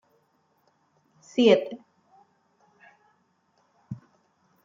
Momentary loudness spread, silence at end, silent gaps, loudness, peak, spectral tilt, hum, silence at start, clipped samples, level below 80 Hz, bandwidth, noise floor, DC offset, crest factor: 23 LU; 0.7 s; none; -23 LUFS; -6 dBFS; -5.5 dB/octave; none; 1.35 s; under 0.1%; -78 dBFS; 7.6 kHz; -69 dBFS; under 0.1%; 24 dB